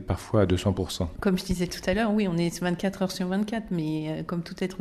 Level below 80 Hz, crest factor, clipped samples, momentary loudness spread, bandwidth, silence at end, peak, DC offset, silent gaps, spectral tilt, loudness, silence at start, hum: -46 dBFS; 16 dB; under 0.1%; 7 LU; 13.5 kHz; 0 s; -10 dBFS; under 0.1%; none; -6 dB/octave; -27 LUFS; 0 s; none